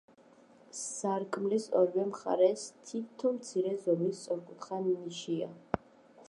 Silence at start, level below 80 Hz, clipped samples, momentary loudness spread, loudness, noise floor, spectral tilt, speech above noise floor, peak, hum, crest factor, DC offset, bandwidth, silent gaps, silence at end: 0.75 s; -68 dBFS; under 0.1%; 12 LU; -33 LUFS; -60 dBFS; -5.5 dB/octave; 28 dB; -10 dBFS; none; 22 dB; under 0.1%; 11.5 kHz; none; 0.55 s